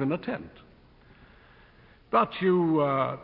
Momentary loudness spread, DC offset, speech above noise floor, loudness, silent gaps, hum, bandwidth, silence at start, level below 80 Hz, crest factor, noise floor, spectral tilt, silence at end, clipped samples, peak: 13 LU; under 0.1%; 30 dB; -26 LUFS; none; none; 5.2 kHz; 0 s; -60 dBFS; 18 dB; -56 dBFS; -11 dB/octave; 0 s; under 0.1%; -10 dBFS